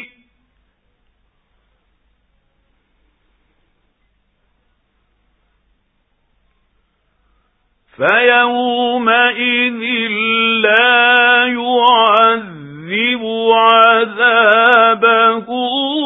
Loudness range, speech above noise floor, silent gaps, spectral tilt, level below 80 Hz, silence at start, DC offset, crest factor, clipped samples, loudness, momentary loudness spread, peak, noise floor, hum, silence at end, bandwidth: 6 LU; 51 dB; none; -5.5 dB/octave; -62 dBFS; 0 s; under 0.1%; 16 dB; under 0.1%; -11 LUFS; 8 LU; 0 dBFS; -63 dBFS; none; 0 s; 4 kHz